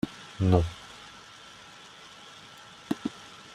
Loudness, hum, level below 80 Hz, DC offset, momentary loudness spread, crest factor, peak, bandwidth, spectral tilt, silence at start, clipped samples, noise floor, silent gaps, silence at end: -29 LUFS; none; -50 dBFS; under 0.1%; 22 LU; 26 dB; -8 dBFS; 12 kHz; -7 dB/octave; 0.05 s; under 0.1%; -49 dBFS; none; 0.2 s